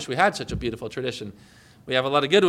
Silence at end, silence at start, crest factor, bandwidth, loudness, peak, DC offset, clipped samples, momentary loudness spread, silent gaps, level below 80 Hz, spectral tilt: 0 s; 0 s; 18 dB; 14.5 kHz; -25 LUFS; -6 dBFS; under 0.1%; under 0.1%; 16 LU; none; -48 dBFS; -4.5 dB/octave